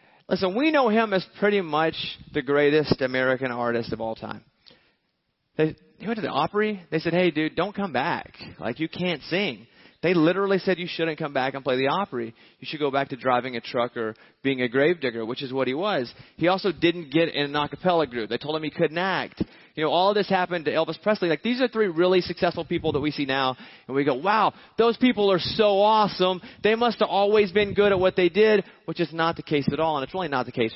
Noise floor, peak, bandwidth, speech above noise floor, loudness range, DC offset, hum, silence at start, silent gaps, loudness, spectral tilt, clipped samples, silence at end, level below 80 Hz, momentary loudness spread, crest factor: -74 dBFS; -6 dBFS; 6 kHz; 51 dB; 5 LU; under 0.1%; none; 0.3 s; none; -24 LUFS; -9 dB/octave; under 0.1%; 0 s; -56 dBFS; 10 LU; 18 dB